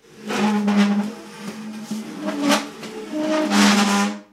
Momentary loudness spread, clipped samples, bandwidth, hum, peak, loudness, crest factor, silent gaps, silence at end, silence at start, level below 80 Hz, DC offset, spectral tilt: 18 LU; under 0.1%; 15 kHz; none; -4 dBFS; -20 LUFS; 18 dB; none; 0.1 s; 0.15 s; -70 dBFS; under 0.1%; -4 dB/octave